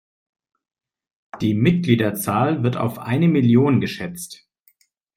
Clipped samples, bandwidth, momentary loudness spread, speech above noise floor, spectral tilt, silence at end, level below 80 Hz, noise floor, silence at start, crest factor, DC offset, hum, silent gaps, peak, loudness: under 0.1%; 16 kHz; 14 LU; 43 dB; -7 dB/octave; 0.8 s; -56 dBFS; -61 dBFS; 1.35 s; 18 dB; under 0.1%; none; none; -2 dBFS; -19 LUFS